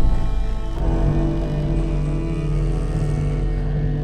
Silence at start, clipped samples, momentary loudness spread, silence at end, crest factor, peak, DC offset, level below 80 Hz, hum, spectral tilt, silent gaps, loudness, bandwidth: 0 s; under 0.1%; 4 LU; 0 s; 12 dB; -8 dBFS; under 0.1%; -22 dBFS; none; -8.5 dB/octave; none; -23 LUFS; 9.2 kHz